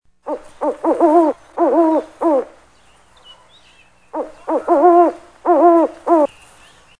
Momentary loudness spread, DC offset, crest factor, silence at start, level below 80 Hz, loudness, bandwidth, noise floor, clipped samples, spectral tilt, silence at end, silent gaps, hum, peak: 17 LU; 0.2%; 16 dB; 0.25 s; -58 dBFS; -15 LUFS; 10 kHz; -51 dBFS; under 0.1%; -6 dB/octave; 0.75 s; none; none; 0 dBFS